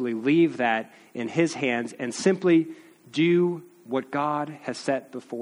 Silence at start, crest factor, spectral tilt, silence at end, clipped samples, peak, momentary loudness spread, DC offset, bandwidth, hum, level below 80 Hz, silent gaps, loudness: 0 s; 18 dB; -5.5 dB/octave; 0 s; under 0.1%; -8 dBFS; 12 LU; under 0.1%; 11.5 kHz; none; -72 dBFS; none; -25 LUFS